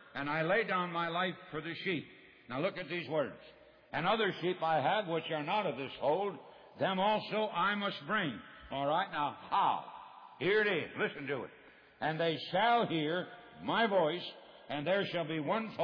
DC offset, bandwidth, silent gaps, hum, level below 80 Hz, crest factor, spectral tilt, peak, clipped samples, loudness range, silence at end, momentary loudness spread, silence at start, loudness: under 0.1%; 5.4 kHz; none; none; -74 dBFS; 16 dB; -7.5 dB/octave; -20 dBFS; under 0.1%; 2 LU; 0 s; 12 LU; 0 s; -34 LUFS